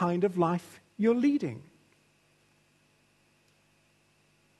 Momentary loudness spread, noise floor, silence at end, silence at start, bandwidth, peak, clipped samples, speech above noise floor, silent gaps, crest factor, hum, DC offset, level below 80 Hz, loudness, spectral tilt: 17 LU; -67 dBFS; 3 s; 0 s; 12.5 kHz; -12 dBFS; under 0.1%; 40 dB; none; 20 dB; 50 Hz at -65 dBFS; under 0.1%; -76 dBFS; -29 LUFS; -8 dB/octave